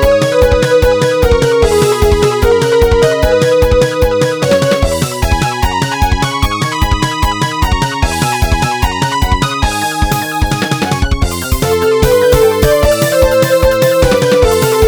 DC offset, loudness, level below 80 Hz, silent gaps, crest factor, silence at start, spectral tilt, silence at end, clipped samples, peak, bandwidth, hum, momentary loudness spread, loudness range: under 0.1%; -11 LUFS; -18 dBFS; none; 10 dB; 0 s; -5 dB/octave; 0 s; under 0.1%; 0 dBFS; over 20 kHz; none; 5 LU; 4 LU